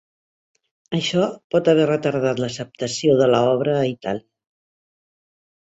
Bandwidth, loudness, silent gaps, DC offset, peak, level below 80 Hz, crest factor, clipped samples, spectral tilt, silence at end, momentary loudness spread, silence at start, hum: 8.2 kHz; -20 LUFS; 1.44-1.50 s; under 0.1%; -4 dBFS; -60 dBFS; 18 dB; under 0.1%; -5.5 dB/octave; 1.5 s; 11 LU; 0.9 s; none